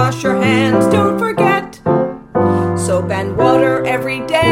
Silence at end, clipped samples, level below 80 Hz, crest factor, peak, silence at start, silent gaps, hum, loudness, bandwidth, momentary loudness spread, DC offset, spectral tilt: 0 s; under 0.1%; -46 dBFS; 14 dB; 0 dBFS; 0 s; none; none; -14 LUFS; 16.5 kHz; 5 LU; under 0.1%; -6 dB/octave